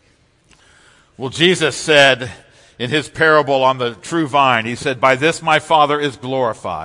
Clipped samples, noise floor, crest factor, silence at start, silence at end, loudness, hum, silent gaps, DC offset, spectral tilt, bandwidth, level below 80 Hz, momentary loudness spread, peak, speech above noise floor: under 0.1%; -56 dBFS; 16 dB; 1.2 s; 0 s; -15 LUFS; none; none; under 0.1%; -4 dB/octave; 12 kHz; -56 dBFS; 9 LU; 0 dBFS; 40 dB